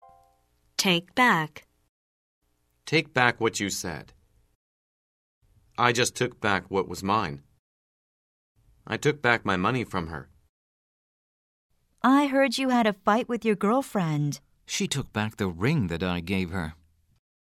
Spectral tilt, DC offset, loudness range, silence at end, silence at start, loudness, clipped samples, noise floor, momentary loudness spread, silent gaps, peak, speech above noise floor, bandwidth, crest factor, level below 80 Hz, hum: -4.5 dB/octave; under 0.1%; 4 LU; 0.8 s; 0.8 s; -26 LUFS; under 0.1%; -67 dBFS; 13 LU; 1.89-2.41 s, 4.55-5.41 s, 7.59-8.55 s, 10.49-11.69 s; -4 dBFS; 41 dB; 16 kHz; 24 dB; -56 dBFS; none